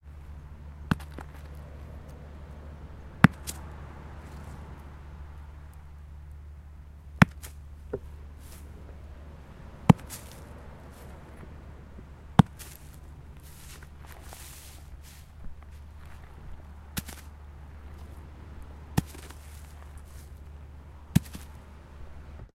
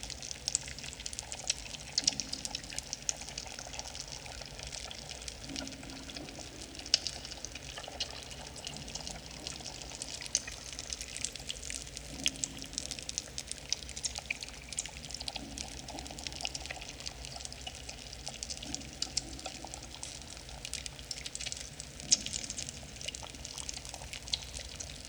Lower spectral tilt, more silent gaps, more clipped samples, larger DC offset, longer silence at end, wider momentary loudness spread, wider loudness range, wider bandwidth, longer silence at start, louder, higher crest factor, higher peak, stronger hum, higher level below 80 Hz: first, -6.5 dB/octave vs -1 dB/octave; neither; neither; neither; about the same, 0.05 s vs 0 s; first, 24 LU vs 10 LU; first, 15 LU vs 5 LU; second, 16 kHz vs over 20 kHz; about the same, 0.05 s vs 0 s; first, -28 LUFS vs -38 LUFS; about the same, 34 dB vs 34 dB; first, 0 dBFS vs -6 dBFS; neither; first, -46 dBFS vs -54 dBFS